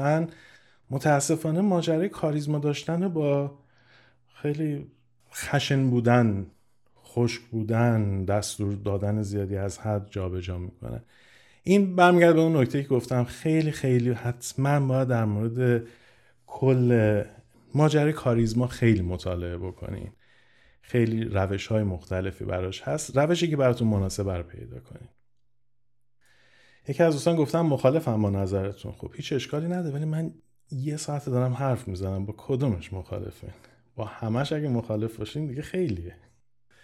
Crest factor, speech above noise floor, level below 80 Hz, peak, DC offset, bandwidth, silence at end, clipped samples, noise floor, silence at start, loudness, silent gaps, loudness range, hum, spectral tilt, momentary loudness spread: 22 dB; 55 dB; -54 dBFS; -4 dBFS; under 0.1%; 14 kHz; 0.7 s; under 0.1%; -80 dBFS; 0 s; -26 LUFS; none; 7 LU; none; -6.5 dB/octave; 14 LU